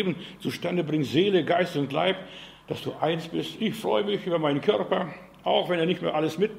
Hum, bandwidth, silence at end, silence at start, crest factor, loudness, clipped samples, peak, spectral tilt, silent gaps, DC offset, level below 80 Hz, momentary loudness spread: none; 16 kHz; 0 s; 0 s; 18 dB; -26 LUFS; under 0.1%; -8 dBFS; -6 dB/octave; none; under 0.1%; -64 dBFS; 11 LU